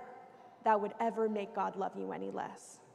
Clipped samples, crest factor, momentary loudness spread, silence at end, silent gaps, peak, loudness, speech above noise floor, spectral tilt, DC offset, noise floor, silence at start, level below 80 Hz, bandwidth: under 0.1%; 20 dB; 17 LU; 0.15 s; none; -18 dBFS; -36 LUFS; 20 dB; -6 dB/octave; under 0.1%; -56 dBFS; 0 s; -88 dBFS; 12 kHz